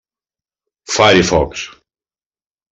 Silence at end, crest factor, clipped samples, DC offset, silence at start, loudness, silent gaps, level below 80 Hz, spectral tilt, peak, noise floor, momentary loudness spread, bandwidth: 1 s; 16 dB; under 0.1%; under 0.1%; 0.9 s; -13 LUFS; none; -38 dBFS; -3.5 dB/octave; 0 dBFS; under -90 dBFS; 17 LU; 8.4 kHz